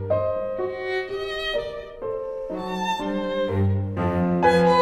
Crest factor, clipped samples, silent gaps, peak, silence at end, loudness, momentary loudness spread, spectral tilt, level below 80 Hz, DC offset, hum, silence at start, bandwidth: 16 dB; under 0.1%; none; -6 dBFS; 0 s; -25 LUFS; 11 LU; -7 dB/octave; -48 dBFS; under 0.1%; none; 0 s; 12.5 kHz